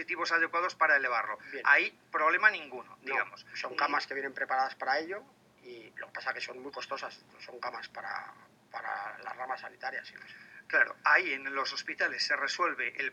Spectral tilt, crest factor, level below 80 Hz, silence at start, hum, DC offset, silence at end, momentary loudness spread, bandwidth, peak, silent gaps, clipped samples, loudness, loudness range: -1.5 dB/octave; 24 dB; -86 dBFS; 0 s; none; under 0.1%; 0 s; 19 LU; 11 kHz; -10 dBFS; none; under 0.1%; -31 LUFS; 12 LU